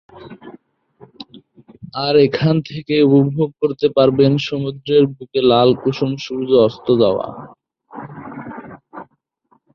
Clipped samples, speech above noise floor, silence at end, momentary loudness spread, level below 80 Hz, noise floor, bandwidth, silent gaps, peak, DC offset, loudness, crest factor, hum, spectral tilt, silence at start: under 0.1%; 45 dB; 0.7 s; 24 LU; -54 dBFS; -60 dBFS; 6.8 kHz; none; -2 dBFS; under 0.1%; -16 LUFS; 16 dB; none; -8 dB/octave; 0.15 s